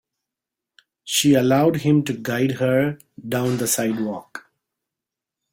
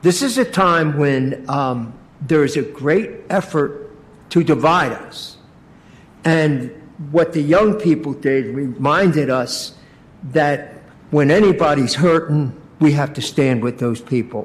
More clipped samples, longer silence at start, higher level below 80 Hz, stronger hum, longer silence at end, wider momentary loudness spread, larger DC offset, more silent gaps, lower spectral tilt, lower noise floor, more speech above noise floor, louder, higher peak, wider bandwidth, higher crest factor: neither; first, 1.05 s vs 0.05 s; second, -60 dBFS vs -50 dBFS; neither; first, 1.15 s vs 0 s; first, 18 LU vs 12 LU; neither; neither; about the same, -5 dB/octave vs -6 dB/octave; first, -86 dBFS vs -45 dBFS; first, 66 dB vs 29 dB; second, -20 LUFS vs -17 LUFS; about the same, -4 dBFS vs -4 dBFS; first, 16.5 kHz vs 14.5 kHz; about the same, 18 dB vs 14 dB